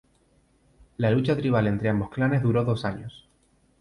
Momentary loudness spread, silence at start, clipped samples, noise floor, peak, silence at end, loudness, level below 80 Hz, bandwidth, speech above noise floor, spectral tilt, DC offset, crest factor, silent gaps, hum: 13 LU; 1 s; under 0.1%; -64 dBFS; -12 dBFS; 0.65 s; -25 LUFS; -52 dBFS; 11 kHz; 40 dB; -8.5 dB/octave; under 0.1%; 14 dB; none; none